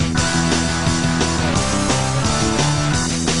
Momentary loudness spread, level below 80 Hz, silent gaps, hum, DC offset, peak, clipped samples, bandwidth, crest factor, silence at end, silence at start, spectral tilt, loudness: 1 LU; -30 dBFS; none; none; 2%; -2 dBFS; under 0.1%; 11.5 kHz; 16 dB; 0 s; 0 s; -4 dB/octave; -18 LUFS